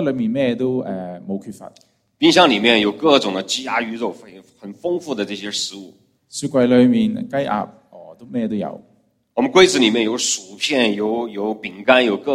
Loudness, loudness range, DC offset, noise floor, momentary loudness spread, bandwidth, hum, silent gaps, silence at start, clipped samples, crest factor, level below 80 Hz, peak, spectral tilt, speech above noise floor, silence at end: -18 LUFS; 4 LU; under 0.1%; -58 dBFS; 16 LU; 14 kHz; none; none; 0 s; under 0.1%; 18 dB; -60 dBFS; 0 dBFS; -3.5 dB/octave; 40 dB; 0 s